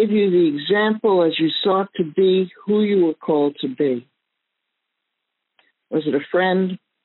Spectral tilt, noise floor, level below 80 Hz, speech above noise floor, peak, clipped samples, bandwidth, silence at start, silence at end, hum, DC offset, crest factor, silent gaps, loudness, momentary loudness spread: -4.5 dB/octave; -78 dBFS; -72 dBFS; 60 dB; -8 dBFS; under 0.1%; 4.2 kHz; 0 s; 0.3 s; none; under 0.1%; 12 dB; none; -19 LUFS; 6 LU